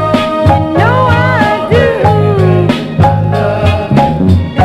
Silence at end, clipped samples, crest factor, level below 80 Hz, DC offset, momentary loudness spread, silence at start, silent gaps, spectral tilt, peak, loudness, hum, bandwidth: 0 s; 0.8%; 8 dB; -28 dBFS; under 0.1%; 3 LU; 0 s; none; -8 dB/octave; 0 dBFS; -10 LUFS; none; 11.5 kHz